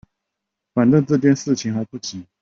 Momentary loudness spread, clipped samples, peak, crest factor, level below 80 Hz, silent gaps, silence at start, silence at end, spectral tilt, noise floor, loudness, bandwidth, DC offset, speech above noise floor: 14 LU; under 0.1%; -4 dBFS; 16 dB; -58 dBFS; none; 0.75 s; 0.2 s; -6.5 dB/octave; -81 dBFS; -19 LUFS; 7.6 kHz; under 0.1%; 63 dB